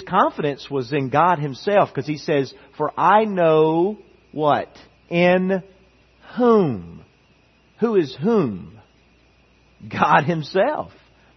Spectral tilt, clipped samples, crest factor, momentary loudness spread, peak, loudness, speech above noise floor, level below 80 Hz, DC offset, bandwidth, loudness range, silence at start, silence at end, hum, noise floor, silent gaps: -7.5 dB/octave; under 0.1%; 20 dB; 14 LU; -2 dBFS; -20 LUFS; 37 dB; -60 dBFS; under 0.1%; 6.4 kHz; 3 LU; 0 s; 0.5 s; none; -56 dBFS; none